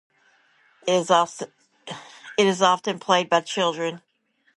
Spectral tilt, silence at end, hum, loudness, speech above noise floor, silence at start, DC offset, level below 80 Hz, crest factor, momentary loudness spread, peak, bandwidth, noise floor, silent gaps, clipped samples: -3.5 dB/octave; 0.6 s; none; -22 LUFS; 40 dB; 0.85 s; under 0.1%; -74 dBFS; 20 dB; 19 LU; -4 dBFS; 11.5 kHz; -61 dBFS; none; under 0.1%